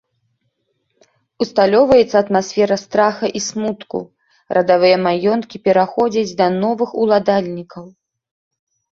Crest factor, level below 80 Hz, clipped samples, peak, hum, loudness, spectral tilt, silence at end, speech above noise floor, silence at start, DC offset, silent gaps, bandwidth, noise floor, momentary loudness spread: 16 dB; -54 dBFS; under 0.1%; -2 dBFS; none; -16 LUFS; -5 dB/octave; 1.1 s; 53 dB; 1.4 s; under 0.1%; none; 7.8 kHz; -69 dBFS; 13 LU